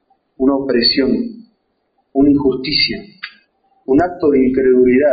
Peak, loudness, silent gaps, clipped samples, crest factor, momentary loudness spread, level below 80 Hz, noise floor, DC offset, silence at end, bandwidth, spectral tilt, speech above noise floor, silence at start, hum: -2 dBFS; -14 LUFS; none; under 0.1%; 12 dB; 16 LU; -44 dBFS; -65 dBFS; under 0.1%; 0 s; 5 kHz; -3 dB/octave; 52 dB; 0.4 s; none